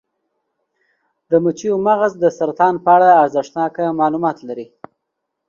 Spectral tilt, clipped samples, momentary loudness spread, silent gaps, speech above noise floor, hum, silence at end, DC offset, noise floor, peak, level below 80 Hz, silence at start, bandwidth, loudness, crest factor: -6.5 dB/octave; under 0.1%; 13 LU; none; 61 dB; none; 0.85 s; under 0.1%; -76 dBFS; 0 dBFS; -64 dBFS; 1.3 s; 7.4 kHz; -15 LUFS; 16 dB